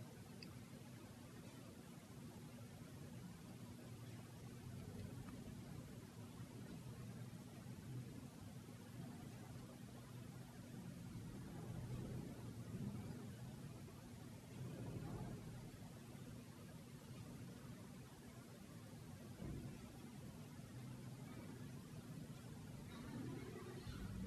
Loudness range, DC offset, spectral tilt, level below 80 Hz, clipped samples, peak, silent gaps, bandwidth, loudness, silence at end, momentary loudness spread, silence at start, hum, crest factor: 4 LU; under 0.1%; -6 dB/octave; -68 dBFS; under 0.1%; -36 dBFS; none; 13 kHz; -55 LUFS; 0 s; 6 LU; 0 s; none; 18 dB